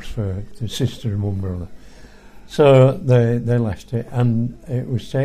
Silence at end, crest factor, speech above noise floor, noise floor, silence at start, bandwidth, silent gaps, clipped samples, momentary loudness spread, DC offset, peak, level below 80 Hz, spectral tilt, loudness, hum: 0 s; 18 dB; 23 dB; -41 dBFS; 0 s; 12.5 kHz; none; under 0.1%; 15 LU; under 0.1%; 0 dBFS; -42 dBFS; -7.5 dB/octave; -19 LUFS; none